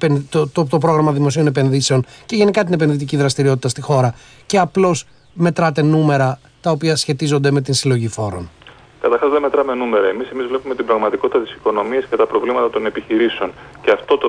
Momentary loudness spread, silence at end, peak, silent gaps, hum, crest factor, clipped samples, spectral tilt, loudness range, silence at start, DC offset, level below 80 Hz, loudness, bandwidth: 7 LU; 0 s; -2 dBFS; none; none; 14 dB; under 0.1%; -6 dB/octave; 2 LU; 0 s; under 0.1%; -52 dBFS; -17 LUFS; 11 kHz